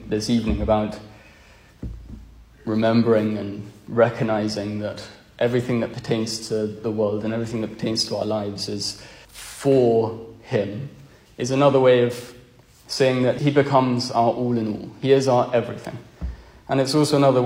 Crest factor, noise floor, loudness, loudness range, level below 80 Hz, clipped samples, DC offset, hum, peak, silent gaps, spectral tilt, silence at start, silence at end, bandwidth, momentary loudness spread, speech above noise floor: 18 dB; -50 dBFS; -21 LUFS; 5 LU; -44 dBFS; under 0.1%; under 0.1%; none; -4 dBFS; none; -6 dB/octave; 0 s; 0 s; 16 kHz; 19 LU; 29 dB